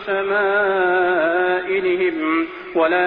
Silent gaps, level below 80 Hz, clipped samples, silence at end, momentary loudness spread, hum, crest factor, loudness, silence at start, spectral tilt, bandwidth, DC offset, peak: none; -58 dBFS; under 0.1%; 0 s; 4 LU; none; 12 dB; -18 LUFS; 0 s; -8 dB/octave; 4.8 kHz; under 0.1%; -6 dBFS